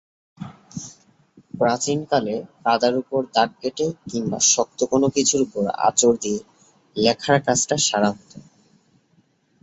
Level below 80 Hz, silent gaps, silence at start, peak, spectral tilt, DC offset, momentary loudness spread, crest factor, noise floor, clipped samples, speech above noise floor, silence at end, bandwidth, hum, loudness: -60 dBFS; none; 0.4 s; -2 dBFS; -3 dB/octave; under 0.1%; 19 LU; 20 dB; -62 dBFS; under 0.1%; 41 dB; 1.2 s; 8.2 kHz; none; -20 LUFS